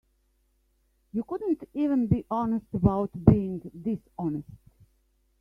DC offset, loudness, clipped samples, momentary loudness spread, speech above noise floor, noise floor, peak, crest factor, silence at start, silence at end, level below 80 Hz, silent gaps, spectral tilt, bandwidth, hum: under 0.1%; -28 LUFS; under 0.1%; 13 LU; 43 dB; -70 dBFS; -4 dBFS; 24 dB; 1.15 s; 0.85 s; -44 dBFS; none; -11.5 dB/octave; 3.6 kHz; none